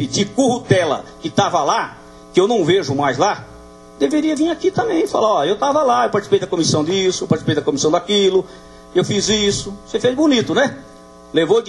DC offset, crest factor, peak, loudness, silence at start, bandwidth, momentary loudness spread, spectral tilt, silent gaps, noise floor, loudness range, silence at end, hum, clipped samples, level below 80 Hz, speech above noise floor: under 0.1%; 18 dB; 0 dBFS; -17 LUFS; 0 s; 12 kHz; 7 LU; -4.5 dB/octave; none; -40 dBFS; 2 LU; 0 s; none; under 0.1%; -48 dBFS; 23 dB